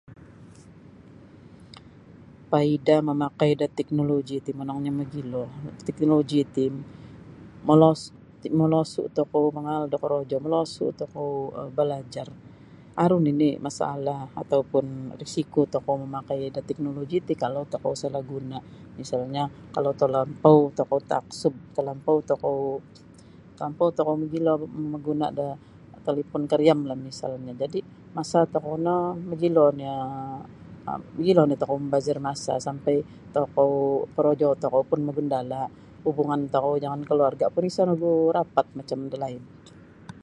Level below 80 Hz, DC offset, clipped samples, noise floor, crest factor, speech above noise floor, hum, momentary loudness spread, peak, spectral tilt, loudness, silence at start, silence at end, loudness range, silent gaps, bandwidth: -60 dBFS; under 0.1%; under 0.1%; -49 dBFS; 24 dB; 24 dB; none; 14 LU; -2 dBFS; -7.5 dB/octave; -25 LUFS; 0.1 s; 0.05 s; 4 LU; none; 11.5 kHz